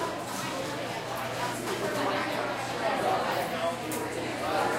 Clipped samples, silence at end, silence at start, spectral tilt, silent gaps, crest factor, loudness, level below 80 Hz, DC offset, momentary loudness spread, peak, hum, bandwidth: under 0.1%; 0 s; 0 s; -3.5 dB/octave; none; 16 dB; -31 LUFS; -62 dBFS; under 0.1%; 5 LU; -16 dBFS; none; 16 kHz